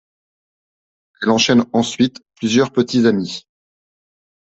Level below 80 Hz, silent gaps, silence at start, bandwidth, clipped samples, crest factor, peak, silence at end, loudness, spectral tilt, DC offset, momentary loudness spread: -58 dBFS; none; 1.2 s; 8.2 kHz; under 0.1%; 18 dB; -2 dBFS; 1 s; -16 LUFS; -4.5 dB/octave; under 0.1%; 10 LU